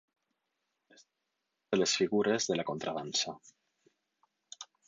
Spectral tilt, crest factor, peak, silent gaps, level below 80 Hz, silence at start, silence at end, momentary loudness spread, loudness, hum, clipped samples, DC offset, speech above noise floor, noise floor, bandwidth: -3 dB/octave; 20 dB; -16 dBFS; none; -76 dBFS; 1.7 s; 0.25 s; 20 LU; -32 LUFS; none; under 0.1%; under 0.1%; 53 dB; -85 dBFS; 9.4 kHz